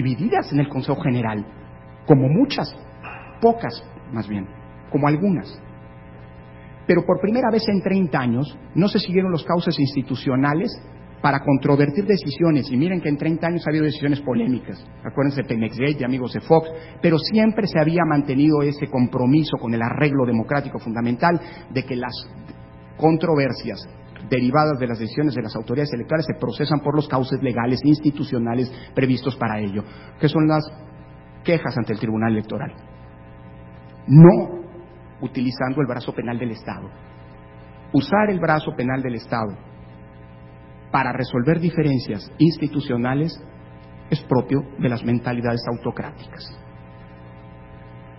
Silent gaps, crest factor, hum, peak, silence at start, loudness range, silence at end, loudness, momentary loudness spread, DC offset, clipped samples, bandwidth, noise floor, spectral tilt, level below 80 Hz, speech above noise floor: none; 20 dB; 60 Hz at -45 dBFS; 0 dBFS; 0 s; 6 LU; 0 s; -21 LUFS; 16 LU; under 0.1%; under 0.1%; 5.8 kHz; -42 dBFS; -11.5 dB/octave; -48 dBFS; 22 dB